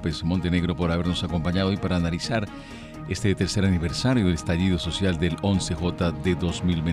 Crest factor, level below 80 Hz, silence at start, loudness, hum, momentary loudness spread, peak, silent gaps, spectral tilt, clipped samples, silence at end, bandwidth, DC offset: 14 dB; -40 dBFS; 0 s; -25 LUFS; none; 4 LU; -10 dBFS; none; -6 dB/octave; under 0.1%; 0 s; 11.5 kHz; under 0.1%